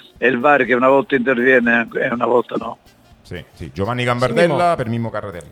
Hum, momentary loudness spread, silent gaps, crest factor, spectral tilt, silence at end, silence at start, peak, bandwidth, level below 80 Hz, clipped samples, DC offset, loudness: none; 18 LU; none; 18 dB; -6.5 dB/octave; 0.05 s; 0.2 s; 0 dBFS; 13 kHz; -52 dBFS; under 0.1%; under 0.1%; -16 LUFS